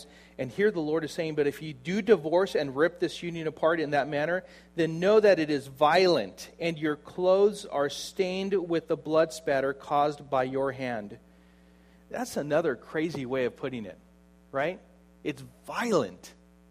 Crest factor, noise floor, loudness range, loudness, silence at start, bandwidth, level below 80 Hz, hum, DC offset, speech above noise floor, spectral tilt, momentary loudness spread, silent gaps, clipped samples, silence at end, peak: 20 dB; -57 dBFS; 8 LU; -28 LUFS; 0 s; 15.5 kHz; -64 dBFS; none; under 0.1%; 30 dB; -5.5 dB/octave; 14 LU; none; under 0.1%; 0.4 s; -8 dBFS